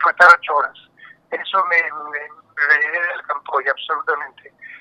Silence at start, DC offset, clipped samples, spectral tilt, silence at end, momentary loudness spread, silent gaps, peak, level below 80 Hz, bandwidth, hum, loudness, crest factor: 0 s; under 0.1%; under 0.1%; -1 dB/octave; 0.05 s; 18 LU; none; 0 dBFS; -74 dBFS; 12 kHz; none; -17 LUFS; 18 dB